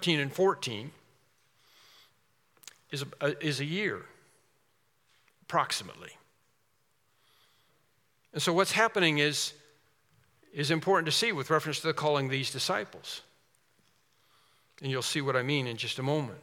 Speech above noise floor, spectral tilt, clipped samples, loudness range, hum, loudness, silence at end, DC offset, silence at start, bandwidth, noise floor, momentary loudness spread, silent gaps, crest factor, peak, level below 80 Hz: 44 dB; -4 dB/octave; under 0.1%; 9 LU; none; -30 LUFS; 0 s; under 0.1%; 0 s; 17.5 kHz; -74 dBFS; 16 LU; none; 24 dB; -10 dBFS; -82 dBFS